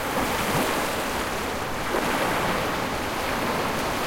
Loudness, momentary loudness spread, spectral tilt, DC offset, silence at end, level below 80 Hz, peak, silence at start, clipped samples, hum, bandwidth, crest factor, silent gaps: -25 LUFS; 4 LU; -3.5 dB/octave; under 0.1%; 0 s; -42 dBFS; -10 dBFS; 0 s; under 0.1%; none; 16.5 kHz; 14 dB; none